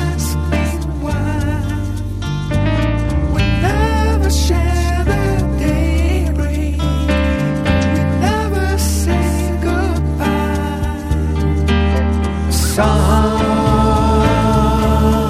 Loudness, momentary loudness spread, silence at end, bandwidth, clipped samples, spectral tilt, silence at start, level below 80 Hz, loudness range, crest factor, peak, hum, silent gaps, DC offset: -16 LUFS; 6 LU; 0 s; 15 kHz; under 0.1%; -6 dB/octave; 0 s; -18 dBFS; 3 LU; 14 dB; -2 dBFS; none; none; under 0.1%